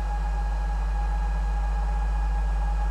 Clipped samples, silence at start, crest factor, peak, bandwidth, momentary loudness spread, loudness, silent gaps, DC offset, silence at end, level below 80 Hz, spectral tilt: under 0.1%; 0 s; 8 dB; -18 dBFS; 8 kHz; 1 LU; -29 LUFS; none; under 0.1%; 0 s; -24 dBFS; -6.5 dB/octave